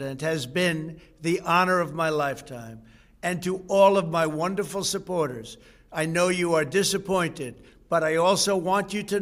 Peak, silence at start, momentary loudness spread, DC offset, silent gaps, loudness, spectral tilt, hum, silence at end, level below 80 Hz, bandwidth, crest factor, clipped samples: -6 dBFS; 0 s; 15 LU; under 0.1%; none; -24 LUFS; -4 dB/octave; none; 0 s; -58 dBFS; 16 kHz; 20 dB; under 0.1%